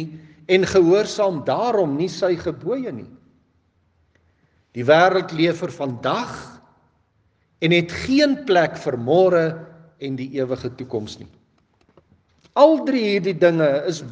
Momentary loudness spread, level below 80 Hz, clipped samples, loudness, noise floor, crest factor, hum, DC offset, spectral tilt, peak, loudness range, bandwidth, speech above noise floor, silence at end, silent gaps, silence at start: 16 LU; -58 dBFS; under 0.1%; -19 LUFS; -64 dBFS; 20 dB; none; under 0.1%; -6 dB/octave; 0 dBFS; 5 LU; 9.2 kHz; 45 dB; 0 s; none; 0 s